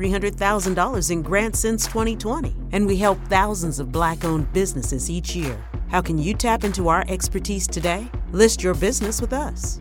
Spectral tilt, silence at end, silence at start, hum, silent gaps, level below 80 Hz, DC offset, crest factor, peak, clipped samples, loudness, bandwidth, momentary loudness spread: -4.5 dB/octave; 0 s; 0 s; none; none; -30 dBFS; under 0.1%; 20 dB; -2 dBFS; under 0.1%; -22 LUFS; 17 kHz; 7 LU